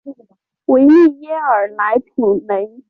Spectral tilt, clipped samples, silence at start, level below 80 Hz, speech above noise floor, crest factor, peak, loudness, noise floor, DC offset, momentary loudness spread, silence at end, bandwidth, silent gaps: -8.5 dB/octave; under 0.1%; 0.05 s; -58 dBFS; 40 dB; 12 dB; -2 dBFS; -14 LUFS; -53 dBFS; under 0.1%; 11 LU; 0.2 s; 5 kHz; none